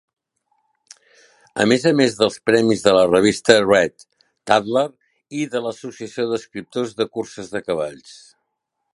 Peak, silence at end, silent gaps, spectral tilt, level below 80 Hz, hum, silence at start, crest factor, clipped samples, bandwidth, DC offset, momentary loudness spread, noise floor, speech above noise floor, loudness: 0 dBFS; 0.85 s; none; -4.5 dB/octave; -58 dBFS; none; 1.55 s; 20 dB; under 0.1%; 11.5 kHz; under 0.1%; 15 LU; -77 dBFS; 58 dB; -19 LUFS